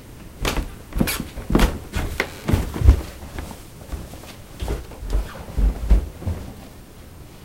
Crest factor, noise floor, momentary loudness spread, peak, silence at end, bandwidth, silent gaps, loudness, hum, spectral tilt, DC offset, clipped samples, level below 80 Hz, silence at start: 22 dB; -41 dBFS; 20 LU; 0 dBFS; 0 s; 16.5 kHz; none; -24 LUFS; none; -5.5 dB/octave; under 0.1%; under 0.1%; -24 dBFS; 0 s